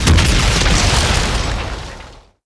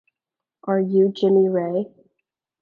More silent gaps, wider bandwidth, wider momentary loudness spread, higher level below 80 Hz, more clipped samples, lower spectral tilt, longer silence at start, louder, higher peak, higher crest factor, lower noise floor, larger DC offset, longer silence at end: neither; first, 11 kHz vs 5 kHz; first, 17 LU vs 14 LU; first, -18 dBFS vs -76 dBFS; neither; second, -3.5 dB/octave vs -9.5 dB/octave; second, 0 s vs 0.65 s; first, -14 LUFS vs -20 LUFS; first, 0 dBFS vs -8 dBFS; about the same, 14 dB vs 14 dB; second, -38 dBFS vs -87 dBFS; neither; second, 0.25 s vs 0.75 s